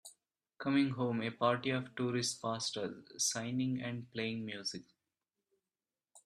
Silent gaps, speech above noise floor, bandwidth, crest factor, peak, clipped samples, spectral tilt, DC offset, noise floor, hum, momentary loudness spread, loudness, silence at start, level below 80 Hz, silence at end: none; over 54 dB; 13 kHz; 20 dB; -18 dBFS; under 0.1%; -4 dB/octave; under 0.1%; under -90 dBFS; none; 9 LU; -36 LUFS; 0.05 s; -78 dBFS; 0.05 s